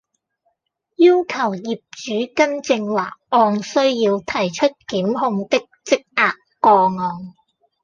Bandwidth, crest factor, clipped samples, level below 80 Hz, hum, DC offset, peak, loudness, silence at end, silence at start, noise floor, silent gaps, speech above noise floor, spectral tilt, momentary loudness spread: 7.4 kHz; 16 dB; under 0.1%; -62 dBFS; none; under 0.1%; -2 dBFS; -18 LUFS; 0.55 s; 1 s; -72 dBFS; none; 53 dB; -5 dB/octave; 11 LU